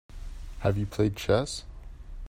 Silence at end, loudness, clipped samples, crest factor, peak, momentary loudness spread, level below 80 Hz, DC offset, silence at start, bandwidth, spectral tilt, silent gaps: 0 s; -29 LUFS; under 0.1%; 20 dB; -10 dBFS; 21 LU; -42 dBFS; under 0.1%; 0.1 s; 16 kHz; -6 dB/octave; none